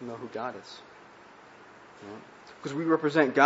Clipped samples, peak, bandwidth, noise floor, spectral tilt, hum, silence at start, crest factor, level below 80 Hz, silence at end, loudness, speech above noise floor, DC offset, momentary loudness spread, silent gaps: under 0.1%; -6 dBFS; 8 kHz; -52 dBFS; -6 dB/octave; none; 0 s; 24 dB; -76 dBFS; 0 s; -29 LUFS; 24 dB; under 0.1%; 26 LU; none